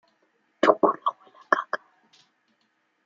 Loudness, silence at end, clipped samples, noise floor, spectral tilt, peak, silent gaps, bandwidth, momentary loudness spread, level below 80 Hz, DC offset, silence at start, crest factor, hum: -25 LUFS; 1.3 s; under 0.1%; -71 dBFS; -4.5 dB/octave; -2 dBFS; none; 7.6 kHz; 13 LU; -80 dBFS; under 0.1%; 0.65 s; 26 dB; none